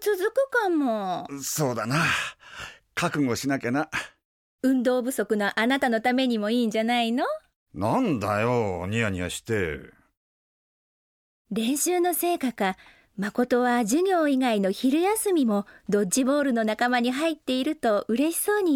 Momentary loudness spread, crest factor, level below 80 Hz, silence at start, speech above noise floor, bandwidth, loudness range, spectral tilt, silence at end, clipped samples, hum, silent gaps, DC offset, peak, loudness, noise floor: 8 LU; 16 dB; -60 dBFS; 0 s; over 66 dB; 17.5 kHz; 5 LU; -4.5 dB/octave; 0 s; under 0.1%; none; 4.25-4.59 s, 7.56-7.66 s, 10.17-11.45 s; under 0.1%; -10 dBFS; -25 LUFS; under -90 dBFS